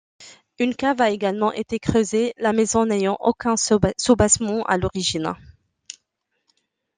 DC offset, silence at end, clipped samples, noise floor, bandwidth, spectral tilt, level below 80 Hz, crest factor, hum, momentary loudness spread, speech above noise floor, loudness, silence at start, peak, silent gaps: under 0.1%; 1.65 s; under 0.1%; -75 dBFS; 10 kHz; -4 dB/octave; -46 dBFS; 20 dB; none; 10 LU; 55 dB; -21 LUFS; 0.2 s; -2 dBFS; none